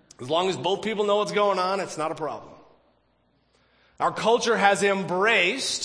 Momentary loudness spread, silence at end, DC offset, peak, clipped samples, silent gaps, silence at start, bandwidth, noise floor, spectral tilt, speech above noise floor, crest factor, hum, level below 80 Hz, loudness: 10 LU; 0 s; under 0.1%; -4 dBFS; under 0.1%; none; 0.2 s; 10.5 kHz; -67 dBFS; -3 dB/octave; 43 dB; 22 dB; 60 Hz at -65 dBFS; -68 dBFS; -23 LUFS